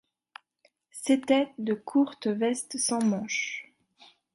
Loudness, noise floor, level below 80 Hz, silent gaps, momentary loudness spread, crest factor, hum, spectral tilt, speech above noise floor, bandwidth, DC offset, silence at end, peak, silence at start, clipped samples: -28 LUFS; -69 dBFS; -76 dBFS; none; 10 LU; 20 dB; none; -3.5 dB/octave; 42 dB; 11.5 kHz; under 0.1%; 0.7 s; -10 dBFS; 0.95 s; under 0.1%